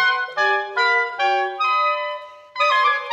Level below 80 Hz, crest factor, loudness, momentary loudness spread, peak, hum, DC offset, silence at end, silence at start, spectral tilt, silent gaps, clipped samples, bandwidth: -80 dBFS; 14 dB; -19 LUFS; 9 LU; -6 dBFS; none; under 0.1%; 0 s; 0 s; -0.5 dB/octave; none; under 0.1%; 9.2 kHz